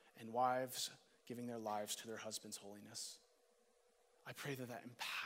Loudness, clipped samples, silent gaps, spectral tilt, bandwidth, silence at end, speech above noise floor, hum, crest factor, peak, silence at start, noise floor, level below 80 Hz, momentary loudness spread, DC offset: -46 LUFS; under 0.1%; none; -3 dB/octave; 16 kHz; 0 s; 30 dB; none; 22 dB; -26 dBFS; 0.05 s; -76 dBFS; under -90 dBFS; 15 LU; under 0.1%